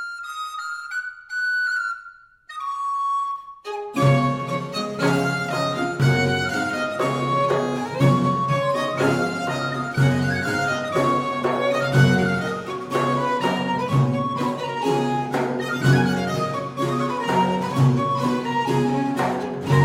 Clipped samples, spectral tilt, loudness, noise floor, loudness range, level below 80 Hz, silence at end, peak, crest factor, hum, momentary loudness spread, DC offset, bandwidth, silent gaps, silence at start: under 0.1%; -6.5 dB/octave; -22 LUFS; -45 dBFS; 3 LU; -54 dBFS; 0 s; -4 dBFS; 18 dB; none; 10 LU; under 0.1%; 15.5 kHz; none; 0 s